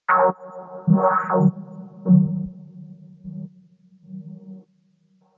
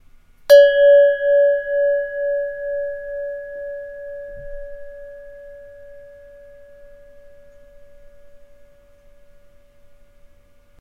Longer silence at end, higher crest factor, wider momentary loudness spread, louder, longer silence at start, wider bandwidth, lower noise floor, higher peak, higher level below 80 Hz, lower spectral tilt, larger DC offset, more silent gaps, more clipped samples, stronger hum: second, 0.8 s vs 2.45 s; about the same, 18 dB vs 20 dB; second, 24 LU vs 27 LU; second, -20 LUFS vs -16 LUFS; second, 0.1 s vs 0.5 s; second, 2.7 kHz vs 15.5 kHz; first, -62 dBFS vs -50 dBFS; second, -6 dBFS vs 0 dBFS; second, -62 dBFS vs -48 dBFS; first, -12 dB/octave vs -1.5 dB/octave; neither; neither; neither; neither